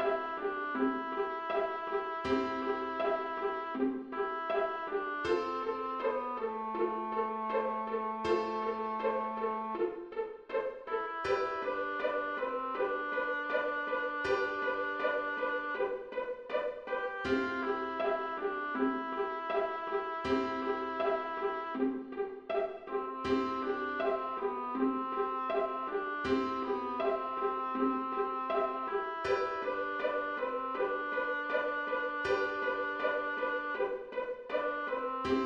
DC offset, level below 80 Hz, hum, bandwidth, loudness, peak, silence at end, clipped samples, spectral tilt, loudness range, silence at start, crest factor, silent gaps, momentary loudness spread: under 0.1%; -66 dBFS; none; 8 kHz; -34 LUFS; -18 dBFS; 0 s; under 0.1%; -5.5 dB/octave; 1 LU; 0 s; 16 dB; none; 4 LU